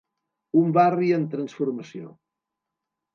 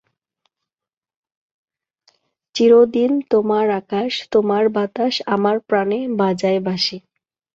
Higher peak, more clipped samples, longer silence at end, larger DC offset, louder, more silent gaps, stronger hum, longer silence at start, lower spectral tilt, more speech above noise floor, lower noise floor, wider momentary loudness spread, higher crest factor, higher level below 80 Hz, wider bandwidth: second, -6 dBFS vs -2 dBFS; neither; first, 1.05 s vs 0.55 s; neither; second, -23 LUFS vs -18 LUFS; neither; neither; second, 0.55 s vs 2.55 s; first, -8.5 dB/octave vs -6 dB/octave; second, 62 dB vs over 73 dB; second, -85 dBFS vs under -90 dBFS; first, 17 LU vs 9 LU; about the same, 18 dB vs 16 dB; second, -78 dBFS vs -64 dBFS; second, 7 kHz vs 7.8 kHz